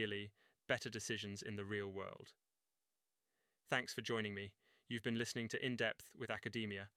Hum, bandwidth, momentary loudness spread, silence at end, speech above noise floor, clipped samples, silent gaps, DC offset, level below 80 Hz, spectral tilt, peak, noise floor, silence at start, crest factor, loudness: none; 15.5 kHz; 10 LU; 0.1 s; over 46 dB; under 0.1%; none; under 0.1%; -80 dBFS; -4 dB/octave; -22 dBFS; under -90 dBFS; 0 s; 24 dB; -44 LUFS